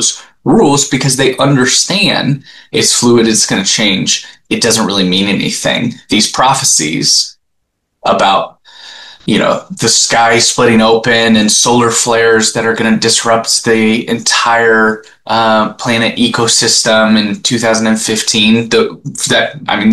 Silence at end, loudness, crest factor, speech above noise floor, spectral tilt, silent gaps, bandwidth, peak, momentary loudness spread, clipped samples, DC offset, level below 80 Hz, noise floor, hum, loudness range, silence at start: 0 s; -10 LUFS; 10 dB; 56 dB; -3 dB/octave; none; 12.5 kHz; 0 dBFS; 7 LU; under 0.1%; 0.4%; -46 dBFS; -66 dBFS; none; 3 LU; 0 s